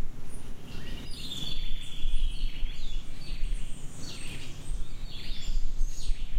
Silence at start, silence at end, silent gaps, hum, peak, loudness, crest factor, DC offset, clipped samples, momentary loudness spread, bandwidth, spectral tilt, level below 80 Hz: 0 s; 0 s; none; none; -12 dBFS; -39 LUFS; 14 dB; under 0.1%; under 0.1%; 7 LU; 10 kHz; -3.5 dB/octave; -30 dBFS